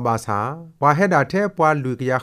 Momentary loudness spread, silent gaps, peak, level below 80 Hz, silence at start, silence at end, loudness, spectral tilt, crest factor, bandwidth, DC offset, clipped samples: 7 LU; none; 0 dBFS; -58 dBFS; 0 s; 0 s; -19 LUFS; -7 dB/octave; 18 dB; 14.5 kHz; under 0.1%; under 0.1%